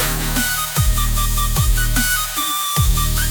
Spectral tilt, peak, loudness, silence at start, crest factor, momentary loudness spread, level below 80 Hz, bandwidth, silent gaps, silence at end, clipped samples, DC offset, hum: -2.5 dB/octave; -4 dBFS; -17 LUFS; 0 s; 14 dB; 2 LU; -20 dBFS; 19.5 kHz; none; 0 s; under 0.1%; under 0.1%; none